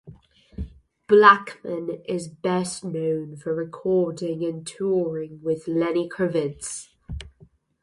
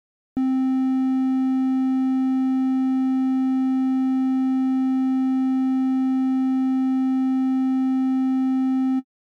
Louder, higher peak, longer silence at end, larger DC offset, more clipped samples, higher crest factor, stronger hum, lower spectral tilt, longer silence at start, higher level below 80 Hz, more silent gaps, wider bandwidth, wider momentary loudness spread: about the same, -23 LUFS vs -22 LUFS; first, 0 dBFS vs -16 dBFS; first, 0.55 s vs 0.25 s; neither; neither; first, 24 dB vs 6 dB; neither; second, -5 dB/octave vs -6.5 dB/octave; second, 0.05 s vs 0.35 s; first, -48 dBFS vs -70 dBFS; neither; first, 11.5 kHz vs 4.7 kHz; first, 21 LU vs 0 LU